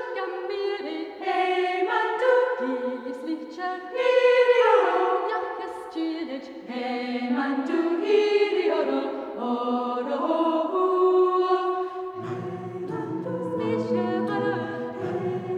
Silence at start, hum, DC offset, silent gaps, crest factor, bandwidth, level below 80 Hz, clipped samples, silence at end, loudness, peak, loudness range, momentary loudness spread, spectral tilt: 0 s; none; under 0.1%; none; 18 dB; 9.2 kHz; -74 dBFS; under 0.1%; 0 s; -25 LUFS; -8 dBFS; 5 LU; 12 LU; -6.5 dB/octave